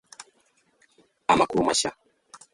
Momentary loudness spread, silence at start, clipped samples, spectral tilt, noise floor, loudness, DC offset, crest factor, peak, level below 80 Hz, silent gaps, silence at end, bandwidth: 24 LU; 0.2 s; under 0.1%; -3 dB/octave; -66 dBFS; -23 LUFS; under 0.1%; 22 dB; -6 dBFS; -56 dBFS; none; 0.6 s; 11.5 kHz